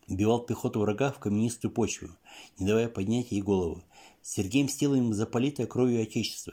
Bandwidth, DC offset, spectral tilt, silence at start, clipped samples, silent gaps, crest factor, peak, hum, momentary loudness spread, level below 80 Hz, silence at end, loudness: 16.5 kHz; under 0.1%; -5.5 dB/octave; 0.1 s; under 0.1%; none; 18 dB; -12 dBFS; none; 10 LU; -62 dBFS; 0 s; -29 LUFS